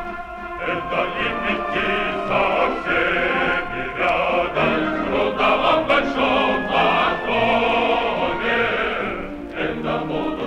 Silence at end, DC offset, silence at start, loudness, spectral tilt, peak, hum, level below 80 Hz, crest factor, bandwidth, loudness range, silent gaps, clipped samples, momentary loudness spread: 0 s; under 0.1%; 0 s; -20 LUFS; -5.5 dB/octave; -6 dBFS; none; -42 dBFS; 16 dB; 11.5 kHz; 3 LU; none; under 0.1%; 8 LU